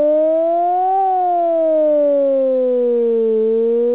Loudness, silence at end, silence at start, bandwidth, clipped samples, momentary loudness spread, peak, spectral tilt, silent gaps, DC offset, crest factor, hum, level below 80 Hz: -15 LUFS; 0 s; 0 s; 4 kHz; under 0.1%; 2 LU; -8 dBFS; -10 dB/octave; none; 0.4%; 6 dB; none; -70 dBFS